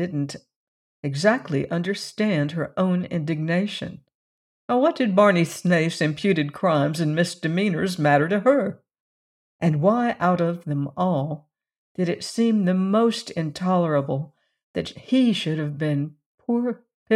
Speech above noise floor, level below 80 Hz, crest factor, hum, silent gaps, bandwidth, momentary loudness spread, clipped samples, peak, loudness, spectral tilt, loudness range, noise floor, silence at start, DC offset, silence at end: over 68 dB; -64 dBFS; 18 dB; none; 0.56-1.03 s, 4.14-4.68 s, 9.00-9.59 s, 11.78-11.95 s, 14.63-14.74 s, 16.26-16.38 s, 16.94-17.06 s; 13 kHz; 11 LU; under 0.1%; -4 dBFS; -23 LUFS; -6.5 dB/octave; 4 LU; under -90 dBFS; 0 s; under 0.1%; 0 s